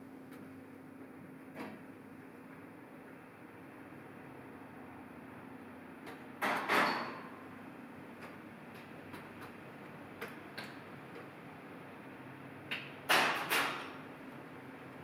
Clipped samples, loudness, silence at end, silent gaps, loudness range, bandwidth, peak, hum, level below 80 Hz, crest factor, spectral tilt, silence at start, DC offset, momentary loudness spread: under 0.1%; -39 LUFS; 0 s; none; 15 LU; over 20 kHz; -16 dBFS; none; -80 dBFS; 26 dB; -3 dB/octave; 0 s; under 0.1%; 21 LU